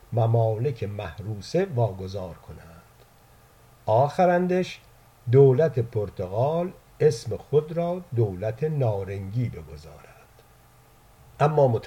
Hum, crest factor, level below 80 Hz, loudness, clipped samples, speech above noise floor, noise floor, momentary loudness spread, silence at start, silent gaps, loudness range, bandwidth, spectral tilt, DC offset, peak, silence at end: none; 20 dB; -54 dBFS; -24 LUFS; under 0.1%; 31 dB; -55 dBFS; 16 LU; 0.1 s; none; 7 LU; 12.5 kHz; -8 dB/octave; under 0.1%; -6 dBFS; 0 s